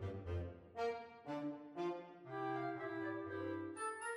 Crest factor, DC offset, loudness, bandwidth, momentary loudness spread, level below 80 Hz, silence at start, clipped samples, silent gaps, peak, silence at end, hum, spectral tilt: 16 dB; under 0.1%; -45 LUFS; 11 kHz; 6 LU; -64 dBFS; 0 s; under 0.1%; none; -30 dBFS; 0 s; none; -6 dB/octave